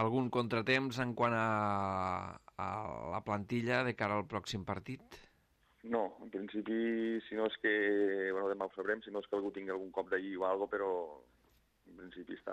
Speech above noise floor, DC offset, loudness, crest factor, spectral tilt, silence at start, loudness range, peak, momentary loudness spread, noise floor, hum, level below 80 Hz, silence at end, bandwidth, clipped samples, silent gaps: 36 dB; under 0.1%; -36 LUFS; 18 dB; -6.5 dB/octave; 0 s; 4 LU; -18 dBFS; 11 LU; -72 dBFS; none; -70 dBFS; 0 s; 14 kHz; under 0.1%; none